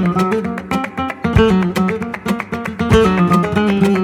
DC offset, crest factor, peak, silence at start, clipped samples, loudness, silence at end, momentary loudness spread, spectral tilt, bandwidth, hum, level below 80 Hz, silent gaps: under 0.1%; 14 dB; 0 dBFS; 0 s; under 0.1%; -16 LUFS; 0 s; 8 LU; -7 dB/octave; 15 kHz; none; -32 dBFS; none